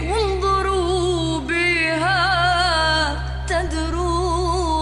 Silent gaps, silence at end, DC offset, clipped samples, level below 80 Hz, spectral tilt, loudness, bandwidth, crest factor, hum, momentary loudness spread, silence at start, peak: none; 0 s; under 0.1%; under 0.1%; -28 dBFS; -4.5 dB/octave; -19 LUFS; 11.5 kHz; 12 dB; none; 6 LU; 0 s; -8 dBFS